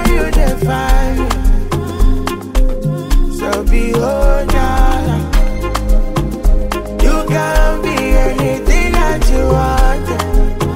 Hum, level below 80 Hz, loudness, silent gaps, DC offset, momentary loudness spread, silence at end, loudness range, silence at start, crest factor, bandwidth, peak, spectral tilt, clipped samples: none; -12 dBFS; -15 LUFS; none; under 0.1%; 5 LU; 0 s; 2 LU; 0 s; 10 dB; 16 kHz; 0 dBFS; -6 dB/octave; under 0.1%